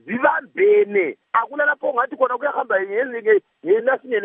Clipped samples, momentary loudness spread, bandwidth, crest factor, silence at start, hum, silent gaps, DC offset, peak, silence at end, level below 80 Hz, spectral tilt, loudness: under 0.1%; 5 LU; 3.7 kHz; 16 dB; 0.05 s; none; none; under 0.1%; -2 dBFS; 0 s; -84 dBFS; -3 dB/octave; -19 LUFS